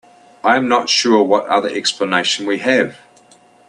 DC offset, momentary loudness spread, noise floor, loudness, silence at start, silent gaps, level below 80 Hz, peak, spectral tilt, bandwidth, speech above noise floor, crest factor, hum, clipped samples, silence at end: under 0.1%; 5 LU; -49 dBFS; -15 LUFS; 0.45 s; none; -64 dBFS; 0 dBFS; -2.5 dB/octave; 11 kHz; 33 dB; 16 dB; none; under 0.1%; 0.75 s